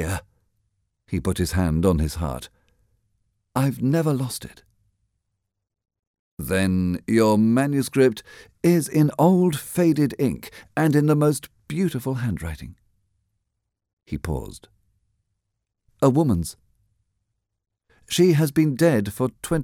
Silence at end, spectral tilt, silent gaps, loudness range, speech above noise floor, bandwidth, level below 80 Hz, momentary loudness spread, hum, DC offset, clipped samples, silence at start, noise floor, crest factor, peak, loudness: 0 s; -6.5 dB/octave; 5.99-6.37 s, 13.93-13.97 s; 10 LU; 59 dB; 17 kHz; -42 dBFS; 14 LU; none; under 0.1%; under 0.1%; 0 s; -80 dBFS; 20 dB; -4 dBFS; -22 LUFS